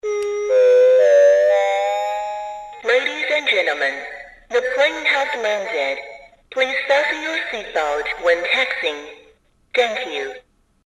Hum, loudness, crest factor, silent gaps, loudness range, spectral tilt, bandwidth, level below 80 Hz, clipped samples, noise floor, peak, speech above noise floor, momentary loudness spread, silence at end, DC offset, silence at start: none; -18 LUFS; 16 dB; none; 5 LU; -1 dB/octave; 11.5 kHz; -58 dBFS; under 0.1%; -55 dBFS; -4 dBFS; 35 dB; 16 LU; 0.45 s; under 0.1%; 0.05 s